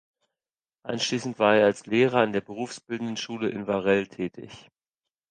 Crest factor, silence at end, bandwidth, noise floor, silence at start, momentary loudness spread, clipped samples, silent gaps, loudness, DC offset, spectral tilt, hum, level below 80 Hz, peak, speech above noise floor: 20 dB; 0.7 s; 9.8 kHz; under -90 dBFS; 0.85 s; 14 LU; under 0.1%; none; -26 LUFS; under 0.1%; -4.5 dB/octave; none; -66 dBFS; -6 dBFS; over 65 dB